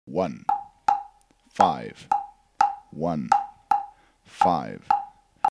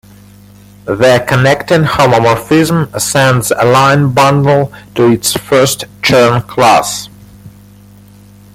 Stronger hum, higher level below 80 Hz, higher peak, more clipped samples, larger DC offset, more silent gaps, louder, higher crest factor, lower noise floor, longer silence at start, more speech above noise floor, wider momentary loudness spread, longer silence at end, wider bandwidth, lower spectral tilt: second, none vs 50 Hz at -30 dBFS; second, -62 dBFS vs -40 dBFS; about the same, -2 dBFS vs 0 dBFS; neither; neither; neither; second, -26 LUFS vs -9 LUFS; first, 24 dB vs 10 dB; first, -56 dBFS vs -38 dBFS; second, 0.05 s vs 0.85 s; first, 33 dB vs 28 dB; first, 9 LU vs 6 LU; second, 0 s vs 1.05 s; second, 11 kHz vs 16.5 kHz; about the same, -5.5 dB/octave vs -5 dB/octave